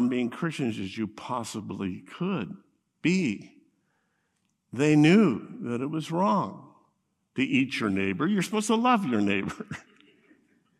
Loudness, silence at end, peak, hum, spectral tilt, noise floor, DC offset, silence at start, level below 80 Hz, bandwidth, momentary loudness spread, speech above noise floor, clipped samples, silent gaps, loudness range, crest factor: -27 LUFS; 1 s; -8 dBFS; none; -6 dB/octave; -75 dBFS; under 0.1%; 0 s; -72 dBFS; 13.5 kHz; 15 LU; 49 dB; under 0.1%; none; 6 LU; 20 dB